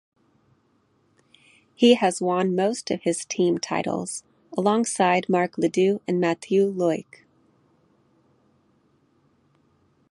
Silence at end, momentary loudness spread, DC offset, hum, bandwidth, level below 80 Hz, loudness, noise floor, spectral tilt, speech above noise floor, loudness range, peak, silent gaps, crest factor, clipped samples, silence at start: 3.1 s; 8 LU; under 0.1%; none; 11.5 kHz; -72 dBFS; -23 LUFS; -65 dBFS; -5 dB/octave; 43 dB; 5 LU; -4 dBFS; none; 20 dB; under 0.1%; 1.8 s